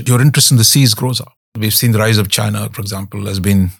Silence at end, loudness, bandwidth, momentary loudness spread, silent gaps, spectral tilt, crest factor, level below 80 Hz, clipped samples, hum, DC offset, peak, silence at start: 0.05 s; -12 LUFS; 19 kHz; 14 LU; 1.37-1.52 s; -4 dB/octave; 12 dB; -50 dBFS; under 0.1%; none; under 0.1%; 0 dBFS; 0 s